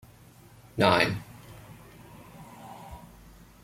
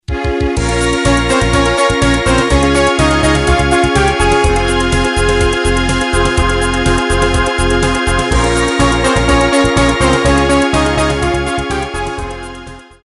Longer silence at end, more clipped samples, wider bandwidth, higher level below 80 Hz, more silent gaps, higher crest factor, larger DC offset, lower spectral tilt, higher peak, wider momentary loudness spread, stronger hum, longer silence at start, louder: first, 0.65 s vs 0.25 s; neither; first, 16.5 kHz vs 11.5 kHz; second, -56 dBFS vs -20 dBFS; neither; first, 26 dB vs 10 dB; second, under 0.1% vs 0.1%; about the same, -5 dB/octave vs -4.5 dB/octave; second, -6 dBFS vs -2 dBFS; first, 27 LU vs 6 LU; neither; first, 0.75 s vs 0.1 s; second, -25 LUFS vs -12 LUFS